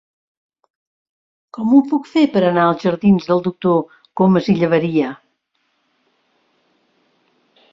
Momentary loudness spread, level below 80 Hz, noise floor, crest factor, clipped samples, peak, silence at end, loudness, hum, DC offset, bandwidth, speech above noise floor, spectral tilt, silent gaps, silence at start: 7 LU; -56 dBFS; -67 dBFS; 16 dB; under 0.1%; -2 dBFS; 2.55 s; -16 LUFS; none; under 0.1%; 7.6 kHz; 53 dB; -8.5 dB/octave; none; 1.55 s